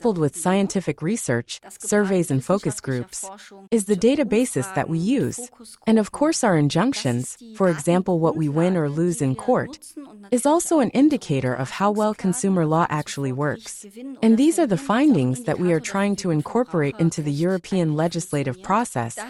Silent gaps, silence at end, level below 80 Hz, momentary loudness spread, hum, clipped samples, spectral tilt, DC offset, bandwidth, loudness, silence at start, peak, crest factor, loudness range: none; 0 s; -56 dBFS; 9 LU; none; under 0.1%; -6 dB/octave; under 0.1%; 13 kHz; -22 LUFS; 0 s; -6 dBFS; 14 dB; 2 LU